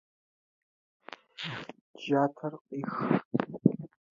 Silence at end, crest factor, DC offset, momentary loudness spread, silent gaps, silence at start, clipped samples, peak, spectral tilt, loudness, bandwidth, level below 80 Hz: 0.3 s; 28 dB; under 0.1%; 19 LU; 1.81-1.94 s, 2.61-2.65 s, 3.25-3.31 s; 1.4 s; under 0.1%; -6 dBFS; -8 dB/octave; -32 LUFS; 7.4 kHz; -74 dBFS